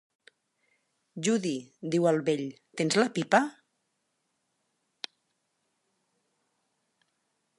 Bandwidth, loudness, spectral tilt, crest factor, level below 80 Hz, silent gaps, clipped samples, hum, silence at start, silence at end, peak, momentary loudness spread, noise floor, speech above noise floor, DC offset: 11.5 kHz; -28 LUFS; -4.5 dB/octave; 24 dB; -82 dBFS; none; under 0.1%; none; 1.15 s; 4.05 s; -8 dBFS; 17 LU; -78 dBFS; 51 dB; under 0.1%